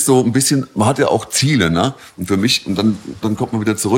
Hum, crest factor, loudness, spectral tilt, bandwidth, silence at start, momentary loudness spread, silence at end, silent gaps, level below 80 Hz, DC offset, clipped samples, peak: none; 14 dB; -16 LUFS; -4.5 dB/octave; 17 kHz; 0 s; 7 LU; 0 s; none; -46 dBFS; under 0.1%; under 0.1%; -2 dBFS